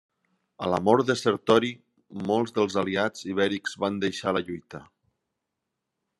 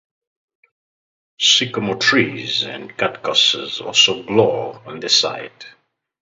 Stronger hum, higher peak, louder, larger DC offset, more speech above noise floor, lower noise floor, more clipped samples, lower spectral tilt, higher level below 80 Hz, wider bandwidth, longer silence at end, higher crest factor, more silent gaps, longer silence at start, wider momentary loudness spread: neither; second, -4 dBFS vs 0 dBFS; second, -26 LUFS vs -16 LUFS; neither; second, 58 dB vs over 72 dB; second, -83 dBFS vs under -90 dBFS; neither; first, -5 dB/octave vs -2 dB/octave; second, -68 dBFS vs -62 dBFS; first, 12 kHz vs 8 kHz; first, 1.35 s vs 0.5 s; about the same, 22 dB vs 20 dB; neither; second, 0.6 s vs 1.4 s; first, 16 LU vs 12 LU